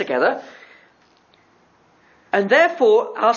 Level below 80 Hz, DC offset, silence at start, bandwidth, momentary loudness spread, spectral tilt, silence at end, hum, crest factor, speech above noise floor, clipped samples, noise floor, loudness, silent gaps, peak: -76 dBFS; under 0.1%; 0 s; 7.2 kHz; 8 LU; -4.5 dB/octave; 0 s; none; 18 dB; 39 dB; under 0.1%; -56 dBFS; -17 LUFS; none; -2 dBFS